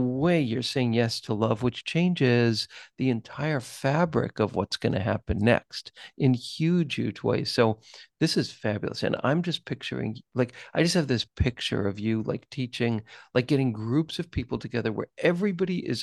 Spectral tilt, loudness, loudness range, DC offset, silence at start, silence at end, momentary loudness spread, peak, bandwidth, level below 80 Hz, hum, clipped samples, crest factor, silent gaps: -6 dB/octave; -27 LUFS; 2 LU; under 0.1%; 0 s; 0 s; 8 LU; -8 dBFS; 12.5 kHz; -48 dBFS; none; under 0.1%; 20 dB; none